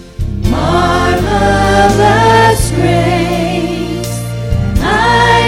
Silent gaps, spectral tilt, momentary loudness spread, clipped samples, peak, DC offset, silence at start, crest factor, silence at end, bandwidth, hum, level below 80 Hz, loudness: none; -5.5 dB/octave; 10 LU; under 0.1%; 0 dBFS; under 0.1%; 0 s; 10 dB; 0 s; 16.5 kHz; none; -22 dBFS; -11 LUFS